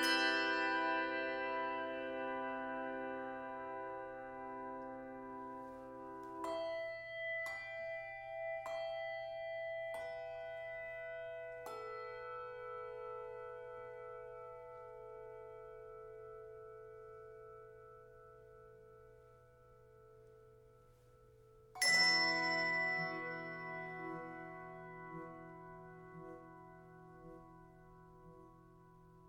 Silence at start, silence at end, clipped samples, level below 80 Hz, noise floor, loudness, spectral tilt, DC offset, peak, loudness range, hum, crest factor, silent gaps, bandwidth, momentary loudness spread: 0 s; 0 s; under 0.1%; -72 dBFS; -65 dBFS; -40 LUFS; -2.5 dB/octave; under 0.1%; -20 dBFS; 22 LU; none; 22 dB; none; 17.5 kHz; 24 LU